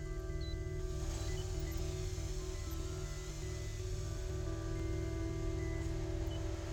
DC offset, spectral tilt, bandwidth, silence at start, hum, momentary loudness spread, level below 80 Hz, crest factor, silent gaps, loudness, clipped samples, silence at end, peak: under 0.1%; -5.5 dB/octave; over 20 kHz; 0 s; none; 3 LU; -42 dBFS; 14 dB; none; -42 LUFS; under 0.1%; 0 s; -26 dBFS